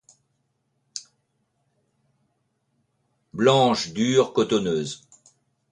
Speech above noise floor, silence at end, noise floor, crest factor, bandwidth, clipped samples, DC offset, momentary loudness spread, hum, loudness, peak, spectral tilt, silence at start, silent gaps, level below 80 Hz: 52 dB; 0.75 s; -73 dBFS; 20 dB; 10.5 kHz; under 0.1%; under 0.1%; 20 LU; none; -22 LUFS; -6 dBFS; -5 dB/octave; 0.95 s; none; -64 dBFS